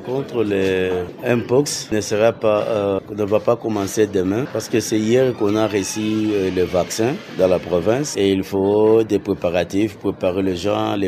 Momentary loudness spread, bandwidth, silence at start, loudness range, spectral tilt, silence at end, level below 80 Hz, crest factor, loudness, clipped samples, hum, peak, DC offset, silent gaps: 5 LU; 15 kHz; 0 s; 1 LU; -5.5 dB/octave; 0 s; -52 dBFS; 16 dB; -19 LUFS; under 0.1%; none; -2 dBFS; under 0.1%; none